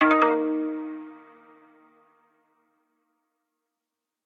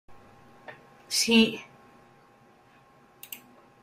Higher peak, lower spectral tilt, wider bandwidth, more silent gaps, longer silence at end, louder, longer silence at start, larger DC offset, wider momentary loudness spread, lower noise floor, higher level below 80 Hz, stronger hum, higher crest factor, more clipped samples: about the same, -6 dBFS vs -8 dBFS; first, -5.5 dB/octave vs -2.5 dB/octave; second, 6.2 kHz vs 15.5 kHz; neither; first, 3.05 s vs 0.45 s; about the same, -24 LUFS vs -23 LUFS; about the same, 0 s vs 0.1 s; neither; second, 21 LU vs 27 LU; first, -86 dBFS vs -58 dBFS; second, -78 dBFS vs -70 dBFS; neither; about the same, 22 dB vs 22 dB; neither